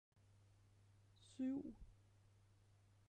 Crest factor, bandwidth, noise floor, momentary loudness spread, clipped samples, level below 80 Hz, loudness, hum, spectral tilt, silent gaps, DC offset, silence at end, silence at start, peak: 18 dB; 10.5 kHz; -72 dBFS; 23 LU; under 0.1%; -72 dBFS; -48 LUFS; none; -7 dB/octave; none; under 0.1%; 1.15 s; 1.2 s; -36 dBFS